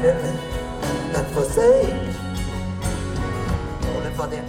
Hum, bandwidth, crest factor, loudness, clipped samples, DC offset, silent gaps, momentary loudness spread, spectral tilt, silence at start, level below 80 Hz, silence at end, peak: none; 16.5 kHz; 16 dB; -23 LUFS; under 0.1%; under 0.1%; none; 11 LU; -6 dB/octave; 0 s; -32 dBFS; 0 s; -6 dBFS